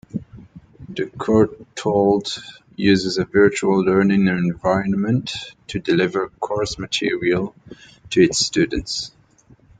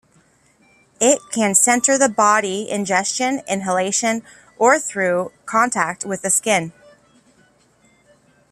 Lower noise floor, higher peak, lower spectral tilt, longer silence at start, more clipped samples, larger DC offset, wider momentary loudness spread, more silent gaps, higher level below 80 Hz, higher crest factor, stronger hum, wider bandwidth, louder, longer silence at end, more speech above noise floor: second, -52 dBFS vs -57 dBFS; about the same, -2 dBFS vs 0 dBFS; first, -5 dB/octave vs -2.5 dB/octave; second, 0.15 s vs 1 s; neither; neither; first, 13 LU vs 9 LU; neither; first, -46 dBFS vs -64 dBFS; about the same, 18 dB vs 20 dB; neither; second, 9.4 kHz vs 15 kHz; about the same, -19 LUFS vs -18 LUFS; second, 0.7 s vs 1.8 s; second, 33 dB vs 38 dB